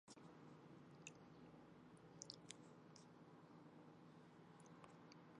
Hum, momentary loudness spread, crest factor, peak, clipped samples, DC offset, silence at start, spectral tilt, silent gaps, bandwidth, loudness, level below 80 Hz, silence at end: none; 7 LU; 34 dB; -30 dBFS; under 0.1%; under 0.1%; 0.05 s; -4 dB/octave; none; 10 kHz; -63 LUFS; -90 dBFS; 0 s